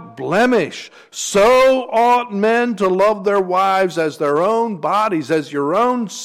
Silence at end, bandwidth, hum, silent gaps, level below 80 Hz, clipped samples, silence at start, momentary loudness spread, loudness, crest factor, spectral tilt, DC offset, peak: 0 s; 16 kHz; none; none; -52 dBFS; under 0.1%; 0 s; 7 LU; -16 LUFS; 10 dB; -4.5 dB/octave; under 0.1%; -6 dBFS